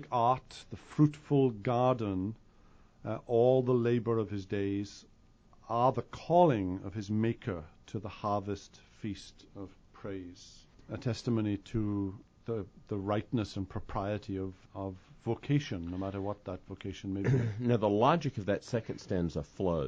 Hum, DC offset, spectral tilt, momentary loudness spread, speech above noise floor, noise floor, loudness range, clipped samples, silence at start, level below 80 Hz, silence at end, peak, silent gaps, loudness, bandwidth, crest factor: none; under 0.1%; -8 dB/octave; 16 LU; 29 dB; -61 dBFS; 7 LU; under 0.1%; 0 s; -56 dBFS; 0 s; -12 dBFS; none; -33 LUFS; 8.8 kHz; 20 dB